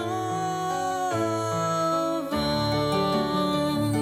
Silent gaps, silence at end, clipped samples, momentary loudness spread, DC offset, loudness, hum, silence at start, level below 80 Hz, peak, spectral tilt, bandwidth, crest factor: none; 0 s; under 0.1%; 3 LU; under 0.1%; -26 LUFS; none; 0 s; -50 dBFS; -12 dBFS; -5.5 dB/octave; 16 kHz; 12 dB